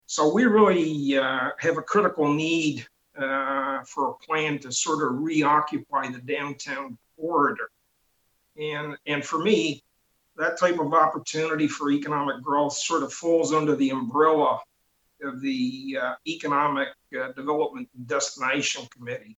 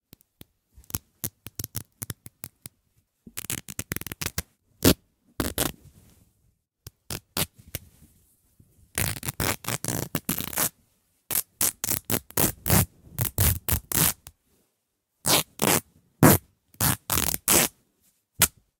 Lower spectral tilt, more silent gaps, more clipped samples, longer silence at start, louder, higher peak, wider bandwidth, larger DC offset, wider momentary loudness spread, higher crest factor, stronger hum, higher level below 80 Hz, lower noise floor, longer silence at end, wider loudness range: about the same, -4 dB/octave vs -3 dB/octave; neither; neither; second, 0.1 s vs 0.95 s; about the same, -25 LUFS vs -25 LUFS; second, -6 dBFS vs -2 dBFS; second, 8.8 kHz vs 19 kHz; neither; second, 12 LU vs 17 LU; second, 20 dB vs 28 dB; neither; second, -72 dBFS vs -46 dBFS; second, -70 dBFS vs -77 dBFS; second, 0.05 s vs 0.3 s; second, 5 LU vs 13 LU